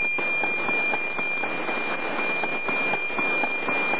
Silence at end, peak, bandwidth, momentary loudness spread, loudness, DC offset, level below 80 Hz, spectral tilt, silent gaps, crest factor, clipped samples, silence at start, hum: 0 s; -12 dBFS; 4 kHz; 4 LU; -24 LUFS; 2%; -76 dBFS; -1 dB/octave; none; 14 dB; under 0.1%; 0 s; none